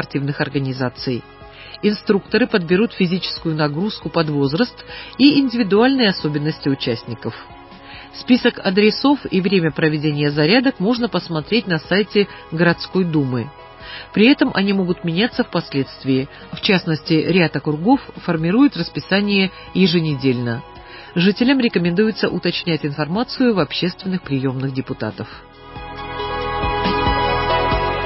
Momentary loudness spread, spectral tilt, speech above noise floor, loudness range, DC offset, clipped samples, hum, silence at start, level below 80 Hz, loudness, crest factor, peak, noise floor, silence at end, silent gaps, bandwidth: 14 LU; -10 dB/octave; 20 dB; 4 LU; under 0.1%; under 0.1%; none; 0 s; -40 dBFS; -18 LUFS; 18 dB; 0 dBFS; -38 dBFS; 0 s; none; 5.8 kHz